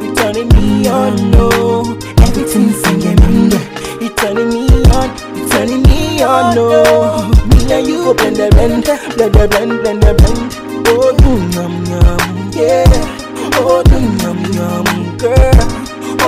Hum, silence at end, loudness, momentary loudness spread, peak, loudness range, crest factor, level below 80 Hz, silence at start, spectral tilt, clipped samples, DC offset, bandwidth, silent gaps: none; 0 s; -11 LUFS; 7 LU; 0 dBFS; 2 LU; 10 dB; -14 dBFS; 0 s; -6 dB/octave; 4%; under 0.1%; 16 kHz; none